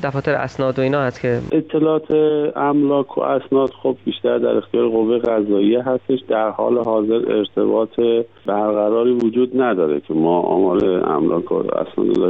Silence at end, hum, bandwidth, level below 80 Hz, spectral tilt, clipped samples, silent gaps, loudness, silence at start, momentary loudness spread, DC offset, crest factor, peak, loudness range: 0 s; none; 7 kHz; -54 dBFS; -8.5 dB/octave; under 0.1%; none; -18 LUFS; 0 s; 4 LU; 0.2%; 10 dB; -6 dBFS; 1 LU